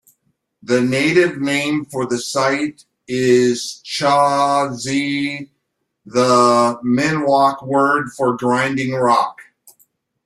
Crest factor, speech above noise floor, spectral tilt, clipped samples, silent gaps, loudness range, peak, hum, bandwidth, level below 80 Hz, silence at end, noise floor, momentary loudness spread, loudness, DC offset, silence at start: 16 dB; 57 dB; -4.5 dB/octave; under 0.1%; none; 2 LU; -2 dBFS; none; 13 kHz; -60 dBFS; 0.85 s; -73 dBFS; 8 LU; -17 LUFS; under 0.1%; 0.65 s